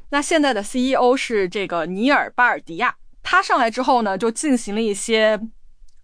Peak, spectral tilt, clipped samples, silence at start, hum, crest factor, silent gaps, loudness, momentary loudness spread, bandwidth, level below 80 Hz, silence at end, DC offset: -4 dBFS; -3.5 dB/octave; under 0.1%; 0.05 s; none; 14 dB; none; -19 LUFS; 6 LU; 10.5 kHz; -48 dBFS; 0.15 s; under 0.1%